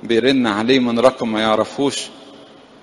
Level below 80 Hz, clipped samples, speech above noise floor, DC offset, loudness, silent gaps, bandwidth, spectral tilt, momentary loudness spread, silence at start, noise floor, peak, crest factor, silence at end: -54 dBFS; under 0.1%; 26 dB; under 0.1%; -17 LUFS; none; 11.5 kHz; -4.5 dB/octave; 6 LU; 0.05 s; -43 dBFS; 0 dBFS; 18 dB; 0.4 s